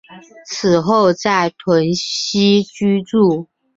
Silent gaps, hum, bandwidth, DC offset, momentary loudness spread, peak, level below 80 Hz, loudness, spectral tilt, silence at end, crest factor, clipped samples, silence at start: none; none; 7.8 kHz; under 0.1%; 5 LU; -2 dBFS; -54 dBFS; -15 LUFS; -5 dB/octave; 0.35 s; 14 dB; under 0.1%; 0.1 s